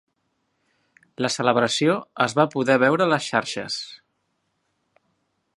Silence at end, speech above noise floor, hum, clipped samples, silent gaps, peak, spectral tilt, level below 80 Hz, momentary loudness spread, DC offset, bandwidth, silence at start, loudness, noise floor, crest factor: 1.6 s; 52 dB; none; under 0.1%; none; -2 dBFS; -4.5 dB/octave; -70 dBFS; 10 LU; under 0.1%; 11.5 kHz; 1.2 s; -21 LUFS; -73 dBFS; 22 dB